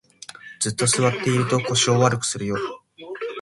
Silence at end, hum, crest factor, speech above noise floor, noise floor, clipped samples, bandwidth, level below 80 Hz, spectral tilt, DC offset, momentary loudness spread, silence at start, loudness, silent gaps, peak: 0 s; none; 20 dB; 21 dB; -42 dBFS; under 0.1%; 11.5 kHz; -58 dBFS; -4 dB/octave; under 0.1%; 20 LU; 0.3 s; -21 LUFS; none; -4 dBFS